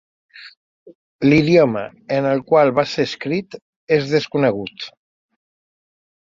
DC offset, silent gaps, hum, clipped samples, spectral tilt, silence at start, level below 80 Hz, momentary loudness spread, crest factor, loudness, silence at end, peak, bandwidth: under 0.1%; 0.57-0.86 s, 0.95-1.19 s, 3.62-3.87 s; none; under 0.1%; -7 dB/octave; 0.35 s; -56 dBFS; 16 LU; 18 dB; -18 LUFS; 1.4 s; -2 dBFS; 7.6 kHz